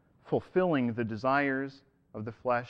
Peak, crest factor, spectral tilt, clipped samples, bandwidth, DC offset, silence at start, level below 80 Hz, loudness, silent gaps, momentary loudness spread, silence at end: -14 dBFS; 16 dB; -8.5 dB/octave; under 0.1%; 7 kHz; under 0.1%; 0.25 s; -66 dBFS; -30 LUFS; none; 14 LU; 0 s